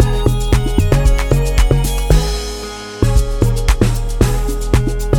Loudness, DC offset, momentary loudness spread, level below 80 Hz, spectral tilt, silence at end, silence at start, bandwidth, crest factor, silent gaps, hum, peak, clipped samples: -16 LUFS; under 0.1%; 6 LU; -16 dBFS; -6 dB/octave; 0 s; 0 s; 17 kHz; 12 dB; none; none; 0 dBFS; under 0.1%